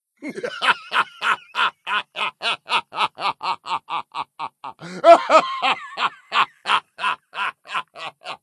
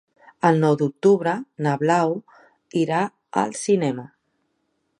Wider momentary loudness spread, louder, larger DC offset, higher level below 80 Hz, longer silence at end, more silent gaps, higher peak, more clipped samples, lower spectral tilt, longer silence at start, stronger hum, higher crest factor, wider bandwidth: first, 16 LU vs 8 LU; about the same, -21 LUFS vs -22 LUFS; neither; second, -80 dBFS vs -72 dBFS; second, 0.05 s vs 0.95 s; neither; about the same, 0 dBFS vs -2 dBFS; neither; second, -2.5 dB/octave vs -6.5 dB/octave; second, 0.2 s vs 0.45 s; neither; about the same, 22 dB vs 20 dB; about the same, 12 kHz vs 11 kHz